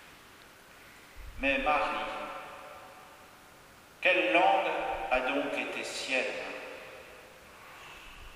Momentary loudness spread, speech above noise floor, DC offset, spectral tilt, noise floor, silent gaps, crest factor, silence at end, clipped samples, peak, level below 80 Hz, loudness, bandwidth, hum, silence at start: 26 LU; 25 dB; under 0.1%; -3 dB/octave; -55 dBFS; none; 22 dB; 0 s; under 0.1%; -12 dBFS; -54 dBFS; -30 LUFS; 15.5 kHz; none; 0 s